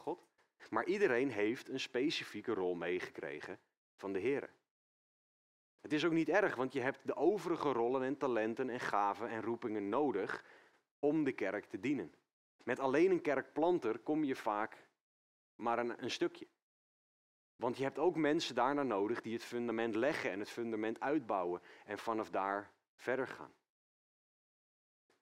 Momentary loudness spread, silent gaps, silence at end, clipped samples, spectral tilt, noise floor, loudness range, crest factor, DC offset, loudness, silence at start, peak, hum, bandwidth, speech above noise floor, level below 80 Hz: 11 LU; 3.77-3.98 s, 4.71-5.78 s, 10.91-11.03 s, 12.33-12.59 s, 15.01-15.59 s, 16.62-17.59 s, 22.88-22.98 s; 1.75 s; under 0.1%; -5.5 dB/octave; under -90 dBFS; 6 LU; 20 dB; under 0.1%; -37 LUFS; 0 s; -18 dBFS; none; 13 kHz; over 53 dB; -84 dBFS